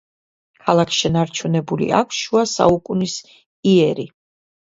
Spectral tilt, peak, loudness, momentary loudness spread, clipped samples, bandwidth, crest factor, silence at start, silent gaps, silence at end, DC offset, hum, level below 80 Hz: -5 dB/octave; 0 dBFS; -18 LUFS; 10 LU; under 0.1%; 7.8 kHz; 18 dB; 0.65 s; 3.46-3.63 s; 0.65 s; under 0.1%; none; -50 dBFS